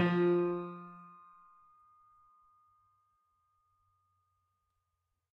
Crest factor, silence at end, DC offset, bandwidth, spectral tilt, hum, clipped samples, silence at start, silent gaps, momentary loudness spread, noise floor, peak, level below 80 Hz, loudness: 22 dB; 4.25 s; under 0.1%; 5.2 kHz; -9.5 dB/octave; none; under 0.1%; 0 s; none; 25 LU; -85 dBFS; -18 dBFS; -86 dBFS; -32 LUFS